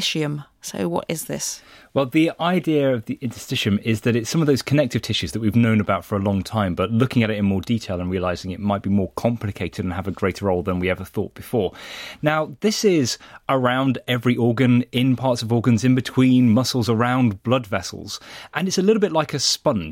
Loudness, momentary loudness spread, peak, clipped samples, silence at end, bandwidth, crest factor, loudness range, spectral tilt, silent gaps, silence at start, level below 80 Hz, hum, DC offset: -21 LUFS; 9 LU; -4 dBFS; under 0.1%; 0 s; 16.5 kHz; 16 dB; 5 LU; -5.5 dB/octave; none; 0 s; -50 dBFS; none; under 0.1%